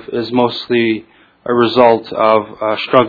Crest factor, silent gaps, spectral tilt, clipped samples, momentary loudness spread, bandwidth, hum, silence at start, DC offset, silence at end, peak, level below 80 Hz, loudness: 14 dB; none; -7.5 dB/octave; 0.1%; 9 LU; 5.4 kHz; none; 0.1 s; under 0.1%; 0 s; 0 dBFS; -54 dBFS; -14 LUFS